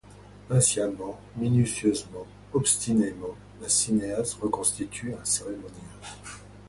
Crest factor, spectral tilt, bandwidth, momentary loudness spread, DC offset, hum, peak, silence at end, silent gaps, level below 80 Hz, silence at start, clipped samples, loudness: 20 dB; -4.5 dB/octave; 12 kHz; 19 LU; under 0.1%; 50 Hz at -45 dBFS; -8 dBFS; 0 s; none; -54 dBFS; 0.1 s; under 0.1%; -26 LUFS